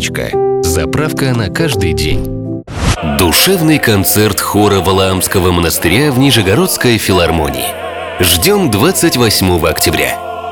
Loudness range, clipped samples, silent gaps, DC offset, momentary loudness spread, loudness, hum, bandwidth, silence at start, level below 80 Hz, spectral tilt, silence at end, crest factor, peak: 2 LU; under 0.1%; none; 0.3%; 7 LU; -11 LUFS; none; over 20 kHz; 0 s; -30 dBFS; -4 dB/octave; 0 s; 12 dB; 0 dBFS